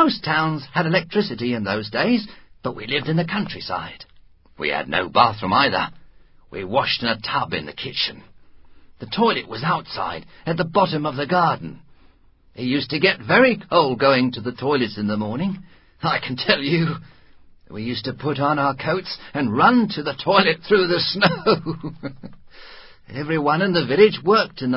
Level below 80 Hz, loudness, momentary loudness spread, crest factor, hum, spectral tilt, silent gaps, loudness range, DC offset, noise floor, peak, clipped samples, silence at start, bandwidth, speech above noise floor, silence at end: -54 dBFS; -20 LUFS; 13 LU; 22 dB; none; -9.5 dB/octave; none; 5 LU; under 0.1%; -53 dBFS; 0 dBFS; under 0.1%; 0 s; 5.8 kHz; 32 dB; 0 s